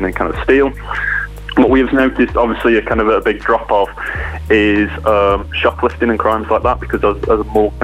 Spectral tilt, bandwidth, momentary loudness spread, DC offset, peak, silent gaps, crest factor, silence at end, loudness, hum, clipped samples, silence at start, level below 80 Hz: -7 dB/octave; 14 kHz; 6 LU; under 0.1%; 0 dBFS; none; 14 dB; 0 s; -14 LUFS; none; under 0.1%; 0 s; -28 dBFS